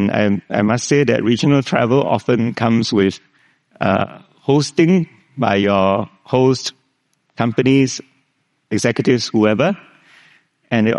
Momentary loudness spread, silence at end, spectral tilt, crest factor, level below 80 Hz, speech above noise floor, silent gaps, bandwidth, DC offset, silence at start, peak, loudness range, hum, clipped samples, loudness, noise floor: 7 LU; 0 s; -6 dB/octave; 16 dB; -58 dBFS; 50 dB; none; 11.5 kHz; under 0.1%; 0 s; 0 dBFS; 2 LU; none; under 0.1%; -16 LUFS; -66 dBFS